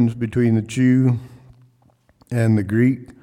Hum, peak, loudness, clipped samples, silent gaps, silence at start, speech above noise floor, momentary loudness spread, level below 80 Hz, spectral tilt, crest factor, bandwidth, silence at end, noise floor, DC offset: none; -6 dBFS; -19 LUFS; under 0.1%; none; 0 s; 40 dB; 5 LU; -54 dBFS; -8 dB/octave; 14 dB; 11.5 kHz; 0.1 s; -58 dBFS; under 0.1%